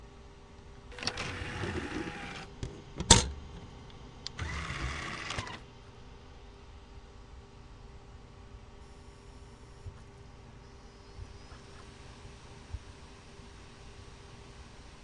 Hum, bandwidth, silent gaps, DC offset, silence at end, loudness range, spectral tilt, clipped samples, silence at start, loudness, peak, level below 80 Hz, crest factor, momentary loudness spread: none; 11.5 kHz; none; under 0.1%; 0 s; 22 LU; -2.5 dB/octave; under 0.1%; 0 s; -32 LUFS; -2 dBFS; -46 dBFS; 38 dB; 16 LU